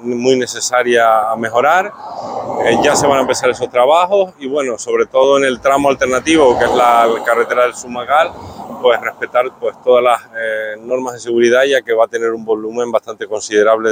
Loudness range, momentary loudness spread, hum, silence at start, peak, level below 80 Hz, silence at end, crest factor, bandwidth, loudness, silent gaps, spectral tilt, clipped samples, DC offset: 3 LU; 9 LU; none; 0 s; 0 dBFS; -50 dBFS; 0 s; 14 dB; 16.5 kHz; -14 LUFS; none; -3.5 dB/octave; under 0.1%; under 0.1%